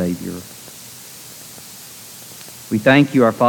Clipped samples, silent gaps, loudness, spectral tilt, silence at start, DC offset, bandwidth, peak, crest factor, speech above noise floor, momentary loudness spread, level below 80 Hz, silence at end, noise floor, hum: under 0.1%; none; -16 LUFS; -5.5 dB/octave; 0 s; under 0.1%; 19 kHz; -2 dBFS; 18 dB; 22 dB; 22 LU; -58 dBFS; 0 s; -38 dBFS; none